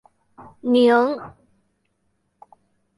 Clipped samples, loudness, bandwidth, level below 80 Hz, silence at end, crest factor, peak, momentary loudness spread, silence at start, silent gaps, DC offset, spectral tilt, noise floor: under 0.1%; -19 LUFS; 11.5 kHz; -66 dBFS; 1.7 s; 18 dB; -6 dBFS; 18 LU; 0.4 s; none; under 0.1%; -5.5 dB/octave; -70 dBFS